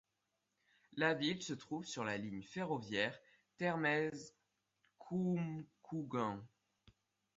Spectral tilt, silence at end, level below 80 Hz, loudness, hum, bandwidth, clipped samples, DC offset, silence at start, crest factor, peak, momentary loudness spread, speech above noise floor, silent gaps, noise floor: -4 dB/octave; 0.9 s; -78 dBFS; -40 LUFS; none; 7.6 kHz; under 0.1%; under 0.1%; 0.9 s; 22 dB; -20 dBFS; 14 LU; 47 dB; none; -87 dBFS